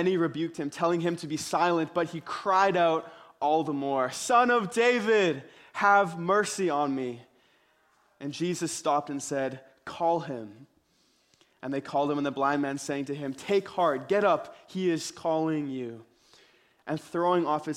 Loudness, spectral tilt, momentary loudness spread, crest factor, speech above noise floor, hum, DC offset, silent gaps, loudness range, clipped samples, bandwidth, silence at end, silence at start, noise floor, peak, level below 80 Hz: -28 LUFS; -4.5 dB/octave; 14 LU; 18 dB; 41 dB; none; under 0.1%; none; 7 LU; under 0.1%; 15.5 kHz; 0 s; 0 s; -68 dBFS; -10 dBFS; -74 dBFS